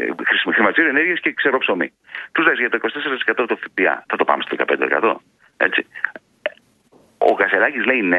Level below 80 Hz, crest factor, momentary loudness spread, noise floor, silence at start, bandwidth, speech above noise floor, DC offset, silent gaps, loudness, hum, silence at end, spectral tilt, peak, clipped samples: -68 dBFS; 18 dB; 11 LU; -54 dBFS; 0 s; 7.2 kHz; 36 dB; under 0.1%; none; -18 LUFS; none; 0 s; -6 dB/octave; 0 dBFS; under 0.1%